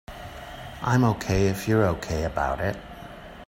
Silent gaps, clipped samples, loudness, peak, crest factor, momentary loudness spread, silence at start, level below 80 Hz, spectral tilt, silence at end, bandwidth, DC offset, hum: none; under 0.1%; -25 LUFS; -8 dBFS; 18 dB; 18 LU; 0.1 s; -42 dBFS; -6.5 dB/octave; 0.05 s; 16.5 kHz; under 0.1%; none